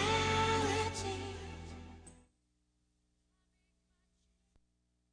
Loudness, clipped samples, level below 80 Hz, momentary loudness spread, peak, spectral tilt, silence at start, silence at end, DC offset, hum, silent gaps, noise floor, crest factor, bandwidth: -34 LUFS; under 0.1%; -56 dBFS; 20 LU; -20 dBFS; -4 dB/octave; 0 s; 3 s; under 0.1%; 60 Hz at -80 dBFS; none; -79 dBFS; 20 dB; 10.5 kHz